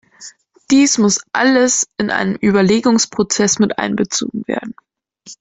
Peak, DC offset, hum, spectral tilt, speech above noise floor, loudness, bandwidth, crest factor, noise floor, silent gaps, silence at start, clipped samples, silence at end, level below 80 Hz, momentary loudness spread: -2 dBFS; under 0.1%; none; -3.5 dB/octave; 27 dB; -15 LUFS; 8.4 kHz; 14 dB; -42 dBFS; none; 0.2 s; under 0.1%; 0.05 s; -52 dBFS; 9 LU